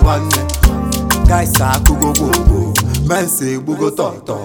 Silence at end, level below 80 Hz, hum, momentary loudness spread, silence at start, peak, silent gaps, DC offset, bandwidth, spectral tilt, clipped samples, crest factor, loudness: 0 s; -16 dBFS; none; 6 LU; 0 s; 0 dBFS; none; under 0.1%; over 20 kHz; -4.5 dB/octave; 0.1%; 12 dB; -14 LUFS